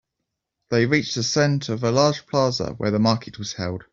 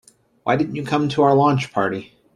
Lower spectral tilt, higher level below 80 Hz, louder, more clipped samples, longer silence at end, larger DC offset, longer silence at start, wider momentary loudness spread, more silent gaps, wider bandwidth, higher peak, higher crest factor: second, -5 dB/octave vs -7 dB/octave; about the same, -54 dBFS vs -58 dBFS; second, -22 LUFS vs -19 LUFS; neither; second, 0.1 s vs 0.3 s; neither; first, 0.7 s vs 0.45 s; about the same, 9 LU vs 10 LU; neither; second, 7.8 kHz vs 11 kHz; about the same, -4 dBFS vs -4 dBFS; about the same, 18 dB vs 16 dB